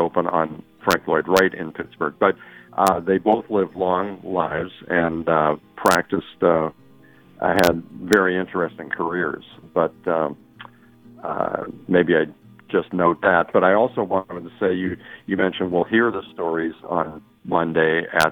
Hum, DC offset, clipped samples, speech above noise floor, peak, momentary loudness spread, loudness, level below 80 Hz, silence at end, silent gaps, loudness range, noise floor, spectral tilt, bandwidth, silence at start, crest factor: none; under 0.1%; under 0.1%; 29 dB; 0 dBFS; 11 LU; -21 LUFS; -54 dBFS; 0 s; none; 4 LU; -50 dBFS; -5.5 dB/octave; 19 kHz; 0 s; 20 dB